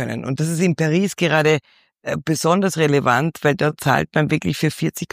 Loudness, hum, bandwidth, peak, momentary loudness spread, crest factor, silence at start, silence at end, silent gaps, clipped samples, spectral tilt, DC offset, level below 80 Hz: -19 LUFS; none; 15.5 kHz; -2 dBFS; 7 LU; 16 dB; 0 s; 0.05 s; none; under 0.1%; -5.5 dB/octave; under 0.1%; -54 dBFS